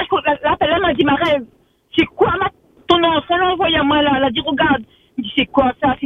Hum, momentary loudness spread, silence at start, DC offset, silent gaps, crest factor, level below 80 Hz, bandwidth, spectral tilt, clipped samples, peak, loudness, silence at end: none; 7 LU; 0 s; under 0.1%; none; 16 dB; -42 dBFS; 7.2 kHz; -6.5 dB/octave; under 0.1%; 0 dBFS; -16 LUFS; 0 s